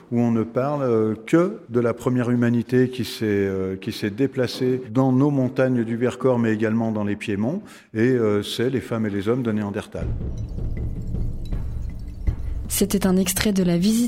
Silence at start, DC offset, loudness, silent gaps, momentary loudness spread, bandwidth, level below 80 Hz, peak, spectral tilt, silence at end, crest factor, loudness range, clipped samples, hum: 0.1 s; under 0.1%; -23 LUFS; none; 10 LU; 16.5 kHz; -34 dBFS; 0 dBFS; -6 dB/octave; 0 s; 20 dB; 6 LU; under 0.1%; none